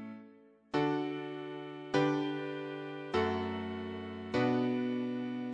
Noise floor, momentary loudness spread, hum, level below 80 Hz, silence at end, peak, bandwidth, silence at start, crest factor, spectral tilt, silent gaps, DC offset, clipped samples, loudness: -59 dBFS; 11 LU; none; -70 dBFS; 0 s; -16 dBFS; 9.2 kHz; 0 s; 20 dB; -7 dB/octave; none; under 0.1%; under 0.1%; -35 LUFS